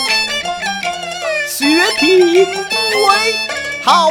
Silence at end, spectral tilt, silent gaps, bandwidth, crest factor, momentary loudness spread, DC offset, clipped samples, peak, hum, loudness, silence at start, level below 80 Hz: 0 s; -2 dB/octave; none; 18.5 kHz; 14 dB; 9 LU; under 0.1%; under 0.1%; 0 dBFS; none; -13 LUFS; 0 s; -52 dBFS